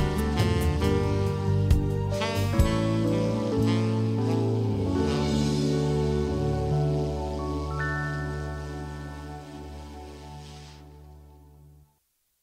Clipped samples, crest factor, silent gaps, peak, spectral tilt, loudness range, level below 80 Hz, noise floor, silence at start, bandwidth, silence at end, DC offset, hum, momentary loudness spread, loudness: under 0.1%; 18 dB; none; -8 dBFS; -7 dB/octave; 15 LU; -36 dBFS; -72 dBFS; 0 s; 16 kHz; 1.05 s; under 0.1%; none; 17 LU; -26 LUFS